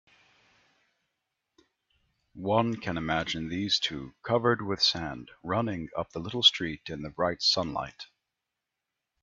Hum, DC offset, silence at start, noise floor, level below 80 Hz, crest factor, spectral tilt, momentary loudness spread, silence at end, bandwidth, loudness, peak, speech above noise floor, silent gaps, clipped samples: none; under 0.1%; 2.35 s; -86 dBFS; -60 dBFS; 24 dB; -4 dB/octave; 17 LU; 1.15 s; 7.8 kHz; -28 LUFS; -8 dBFS; 57 dB; none; under 0.1%